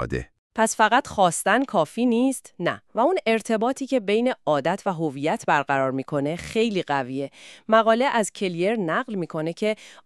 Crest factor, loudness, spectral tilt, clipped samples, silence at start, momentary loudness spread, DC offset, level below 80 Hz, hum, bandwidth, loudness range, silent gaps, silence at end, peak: 20 dB; -23 LUFS; -4.5 dB/octave; under 0.1%; 0 s; 8 LU; under 0.1%; -54 dBFS; none; 13.5 kHz; 2 LU; 0.39-0.50 s; 0.15 s; -4 dBFS